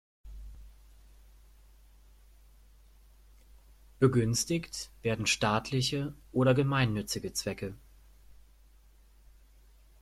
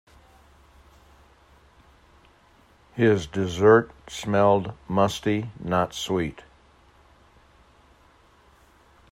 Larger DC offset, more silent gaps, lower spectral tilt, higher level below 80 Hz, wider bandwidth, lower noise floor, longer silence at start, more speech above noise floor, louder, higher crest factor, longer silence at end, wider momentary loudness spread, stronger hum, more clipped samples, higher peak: neither; neither; about the same, -5 dB/octave vs -6 dB/octave; about the same, -54 dBFS vs -54 dBFS; about the same, 14.5 kHz vs 15.5 kHz; about the same, -59 dBFS vs -57 dBFS; second, 0.25 s vs 2.95 s; second, 30 dB vs 35 dB; second, -30 LUFS vs -23 LUFS; about the same, 22 dB vs 22 dB; second, 2.25 s vs 2.7 s; first, 21 LU vs 13 LU; neither; neither; second, -12 dBFS vs -6 dBFS